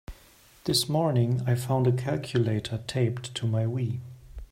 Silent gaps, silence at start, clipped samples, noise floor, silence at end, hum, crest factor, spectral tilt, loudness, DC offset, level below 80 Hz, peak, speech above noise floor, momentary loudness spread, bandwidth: none; 0.1 s; under 0.1%; -56 dBFS; 0.05 s; none; 16 dB; -6 dB/octave; -27 LUFS; under 0.1%; -52 dBFS; -12 dBFS; 30 dB; 9 LU; 16 kHz